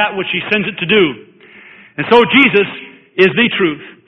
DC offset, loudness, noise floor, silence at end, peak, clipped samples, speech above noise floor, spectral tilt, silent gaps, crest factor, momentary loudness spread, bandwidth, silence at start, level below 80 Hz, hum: under 0.1%; -12 LUFS; -40 dBFS; 0.15 s; 0 dBFS; under 0.1%; 28 dB; -7 dB/octave; none; 14 dB; 16 LU; 6.2 kHz; 0 s; -52 dBFS; none